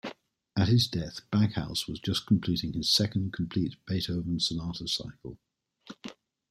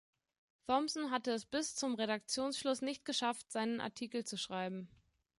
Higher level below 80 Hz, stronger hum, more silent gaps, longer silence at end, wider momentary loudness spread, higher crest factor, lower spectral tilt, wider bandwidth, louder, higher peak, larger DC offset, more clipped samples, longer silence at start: first, -54 dBFS vs -78 dBFS; neither; neither; second, 0.4 s vs 0.55 s; first, 19 LU vs 6 LU; about the same, 18 dB vs 20 dB; first, -5 dB/octave vs -3 dB/octave; first, 14.5 kHz vs 11.5 kHz; first, -29 LUFS vs -38 LUFS; first, -12 dBFS vs -20 dBFS; neither; neither; second, 0.05 s vs 0.7 s